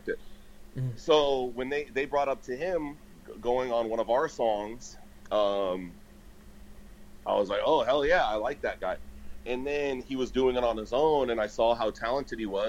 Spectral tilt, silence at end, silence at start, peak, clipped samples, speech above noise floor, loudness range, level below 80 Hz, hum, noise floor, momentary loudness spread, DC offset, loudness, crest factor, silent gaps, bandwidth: -5 dB/octave; 0 s; 0.05 s; -10 dBFS; under 0.1%; 22 dB; 3 LU; -50 dBFS; none; -50 dBFS; 15 LU; under 0.1%; -29 LUFS; 20 dB; none; 16 kHz